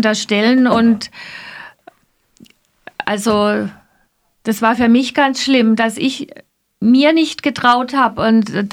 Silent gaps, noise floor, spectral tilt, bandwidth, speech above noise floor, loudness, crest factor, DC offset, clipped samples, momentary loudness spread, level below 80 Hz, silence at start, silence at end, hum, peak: none; -60 dBFS; -4.5 dB/octave; 15.5 kHz; 46 dB; -14 LUFS; 14 dB; under 0.1%; under 0.1%; 17 LU; -54 dBFS; 0 s; 0 s; none; 0 dBFS